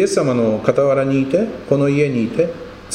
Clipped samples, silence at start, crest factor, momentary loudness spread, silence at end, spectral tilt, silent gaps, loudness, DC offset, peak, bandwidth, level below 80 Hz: under 0.1%; 0 s; 16 dB; 5 LU; 0 s; -6.5 dB/octave; none; -17 LUFS; under 0.1%; 0 dBFS; 11.5 kHz; -48 dBFS